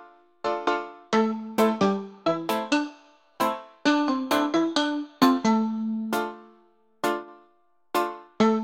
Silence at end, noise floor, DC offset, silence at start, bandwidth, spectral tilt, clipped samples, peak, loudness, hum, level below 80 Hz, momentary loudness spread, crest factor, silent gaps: 0 s; -65 dBFS; under 0.1%; 0 s; 17 kHz; -5 dB/octave; under 0.1%; -4 dBFS; -26 LUFS; none; -70 dBFS; 8 LU; 22 dB; none